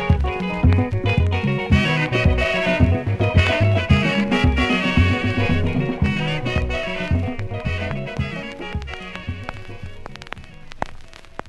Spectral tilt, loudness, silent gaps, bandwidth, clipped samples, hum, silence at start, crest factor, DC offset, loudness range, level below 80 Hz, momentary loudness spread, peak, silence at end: -7 dB/octave; -20 LUFS; none; 10.5 kHz; under 0.1%; none; 0 s; 18 dB; under 0.1%; 11 LU; -26 dBFS; 15 LU; -2 dBFS; 0 s